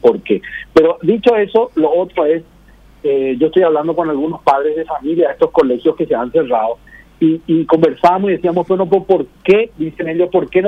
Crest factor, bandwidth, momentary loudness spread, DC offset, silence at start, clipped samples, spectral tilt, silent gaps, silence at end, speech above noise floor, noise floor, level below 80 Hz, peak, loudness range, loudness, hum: 14 dB; 6.8 kHz; 6 LU; under 0.1%; 0.05 s; under 0.1%; -8 dB/octave; none; 0 s; 30 dB; -44 dBFS; -48 dBFS; 0 dBFS; 2 LU; -14 LUFS; none